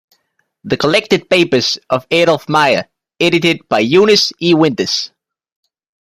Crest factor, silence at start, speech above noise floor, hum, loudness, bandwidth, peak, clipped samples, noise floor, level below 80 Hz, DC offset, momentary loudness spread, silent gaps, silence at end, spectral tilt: 14 dB; 0.65 s; 52 dB; none; -13 LUFS; 15.5 kHz; 0 dBFS; under 0.1%; -65 dBFS; -54 dBFS; under 0.1%; 7 LU; none; 0.95 s; -4.5 dB/octave